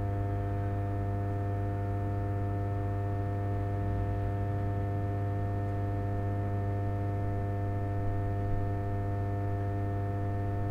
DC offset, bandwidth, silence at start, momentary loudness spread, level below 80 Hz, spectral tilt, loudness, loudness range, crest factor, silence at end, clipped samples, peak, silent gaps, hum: under 0.1%; 3.6 kHz; 0 s; 1 LU; -42 dBFS; -10 dB/octave; -33 LUFS; 0 LU; 12 dB; 0 s; under 0.1%; -20 dBFS; none; 50 Hz at -35 dBFS